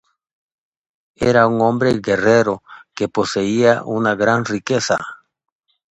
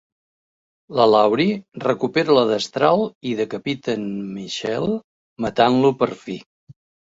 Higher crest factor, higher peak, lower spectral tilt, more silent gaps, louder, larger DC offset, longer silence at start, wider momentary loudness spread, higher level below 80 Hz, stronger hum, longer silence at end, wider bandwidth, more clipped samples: about the same, 18 dB vs 18 dB; about the same, 0 dBFS vs -2 dBFS; about the same, -5.5 dB/octave vs -5.5 dB/octave; second, none vs 3.15-3.21 s, 5.04-5.36 s, 6.46-6.67 s; first, -17 LUFS vs -20 LUFS; neither; first, 1.2 s vs 0.9 s; second, 8 LU vs 12 LU; first, -52 dBFS vs -58 dBFS; neither; first, 0.75 s vs 0.4 s; first, 9.4 kHz vs 8 kHz; neither